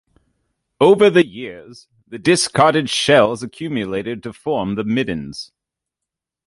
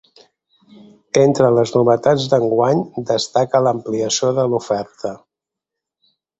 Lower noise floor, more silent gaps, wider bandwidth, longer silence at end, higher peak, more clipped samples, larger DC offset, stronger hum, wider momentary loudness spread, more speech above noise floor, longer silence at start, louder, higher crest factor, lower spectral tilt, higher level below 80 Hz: about the same, -84 dBFS vs -84 dBFS; neither; first, 11.5 kHz vs 8.2 kHz; second, 1 s vs 1.25 s; about the same, -2 dBFS vs 0 dBFS; neither; neither; neither; first, 19 LU vs 8 LU; about the same, 67 dB vs 68 dB; second, 0.8 s vs 1.15 s; about the same, -17 LUFS vs -17 LUFS; about the same, 16 dB vs 18 dB; about the same, -4.5 dB/octave vs -5 dB/octave; about the same, -54 dBFS vs -58 dBFS